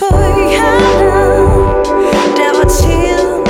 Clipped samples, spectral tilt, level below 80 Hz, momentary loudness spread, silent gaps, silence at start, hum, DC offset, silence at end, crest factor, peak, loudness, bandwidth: under 0.1%; -5.5 dB/octave; -18 dBFS; 3 LU; none; 0 s; none; under 0.1%; 0 s; 8 dB; 0 dBFS; -10 LUFS; 16.5 kHz